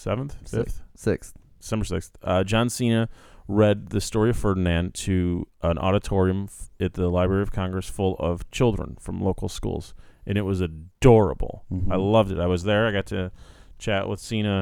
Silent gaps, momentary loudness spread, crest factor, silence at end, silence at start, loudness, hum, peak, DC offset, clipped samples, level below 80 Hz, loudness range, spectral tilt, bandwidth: none; 10 LU; 22 dB; 0 s; 0 s; -24 LUFS; none; -2 dBFS; under 0.1%; under 0.1%; -38 dBFS; 4 LU; -6.5 dB/octave; 16 kHz